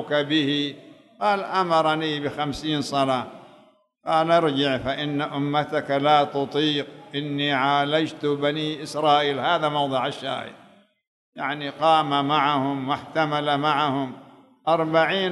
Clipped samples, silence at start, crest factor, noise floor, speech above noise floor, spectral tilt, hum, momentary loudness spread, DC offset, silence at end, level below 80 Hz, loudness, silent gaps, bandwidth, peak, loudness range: under 0.1%; 0 s; 18 dB; -56 dBFS; 34 dB; -5.5 dB/octave; none; 9 LU; under 0.1%; 0 s; -60 dBFS; -23 LUFS; 11.07-11.32 s; 12 kHz; -4 dBFS; 2 LU